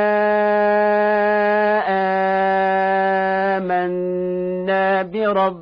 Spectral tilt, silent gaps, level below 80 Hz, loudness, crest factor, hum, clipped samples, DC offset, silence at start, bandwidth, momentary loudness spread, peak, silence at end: -8.5 dB/octave; none; -56 dBFS; -18 LUFS; 12 dB; none; under 0.1%; under 0.1%; 0 s; 5.2 kHz; 5 LU; -6 dBFS; 0 s